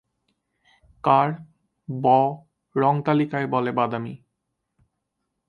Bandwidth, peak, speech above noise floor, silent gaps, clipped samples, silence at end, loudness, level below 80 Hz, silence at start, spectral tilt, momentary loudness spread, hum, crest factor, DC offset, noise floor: 5.6 kHz; -4 dBFS; 57 dB; none; under 0.1%; 1.35 s; -22 LUFS; -66 dBFS; 1.05 s; -9.5 dB/octave; 17 LU; none; 20 dB; under 0.1%; -79 dBFS